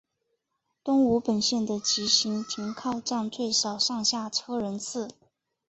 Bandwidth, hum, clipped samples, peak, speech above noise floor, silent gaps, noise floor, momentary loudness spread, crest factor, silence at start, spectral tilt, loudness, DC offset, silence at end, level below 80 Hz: 8.2 kHz; none; under 0.1%; -8 dBFS; 53 dB; none; -80 dBFS; 10 LU; 20 dB; 0.85 s; -3 dB/octave; -26 LUFS; under 0.1%; 0.55 s; -64 dBFS